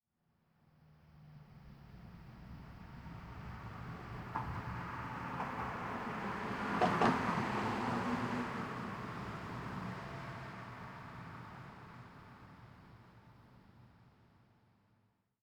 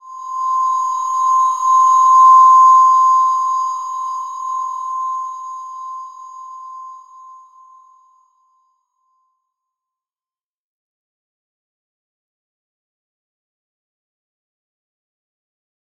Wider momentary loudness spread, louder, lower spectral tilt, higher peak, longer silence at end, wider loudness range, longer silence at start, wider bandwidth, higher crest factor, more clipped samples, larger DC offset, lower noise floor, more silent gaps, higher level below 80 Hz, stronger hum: second, 22 LU vs 26 LU; second, -40 LUFS vs -13 LUFS; first, -6.5 dB/octave vs 7 dB/octave; second, -18 dBFS vs -2 dBFS; second, 1.2 s vs 9 s; second, 19 LU vs 22 LU; first, 0.8 s vs 0.05 s; first, over 20 kHz vs 7.2 kHz; first, 24 dB vs 16 dB; neither; neither; second, -78 dBFS vs under -90 dBFS; neither; first, -60 dBFS vs under -90 dBFS; neither